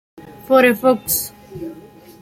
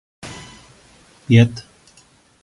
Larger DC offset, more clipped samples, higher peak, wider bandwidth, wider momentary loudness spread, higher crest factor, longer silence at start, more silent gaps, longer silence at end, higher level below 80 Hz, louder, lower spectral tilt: neither; neither; about the same, -2 dBFS vs 0 dBFS; first, 16.5 kHz vs 11.5 kHz; second, 20 LU vs 23 LU; about the same, 18 dB vs 20 dB; about the same, 0.25 s vs 0.25 s; neither; second, 0.4 s vs 0.85 s; about the same, -54 dBFS vs -50 dBFS; about the same, -15 LUFS vs -15 LUFS; second, -3.5 dB/octave vs -7 dB/octave